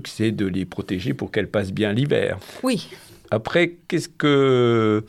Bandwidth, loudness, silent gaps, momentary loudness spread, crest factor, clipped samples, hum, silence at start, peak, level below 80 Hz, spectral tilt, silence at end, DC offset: 14.5 kHz; -22 LUFS; none; 10 LU; 16 dB; under 0.1%; none; 0 s; -4 dBFS; -58 dBFS; -6.5 dB/octave; 0 s; under 0.1%